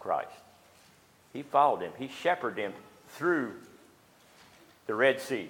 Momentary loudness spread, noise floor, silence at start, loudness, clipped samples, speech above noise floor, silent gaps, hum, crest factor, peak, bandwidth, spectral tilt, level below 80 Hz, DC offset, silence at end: 19 LU; -61 dBFS; 0 s; -30 LUFS; under 0.1%; 31 dB; none; none; 22 dB; -10 dBFS; 18.5 kHz; -5 dB/octave; -78 dBFS; under 0.1%; 0 s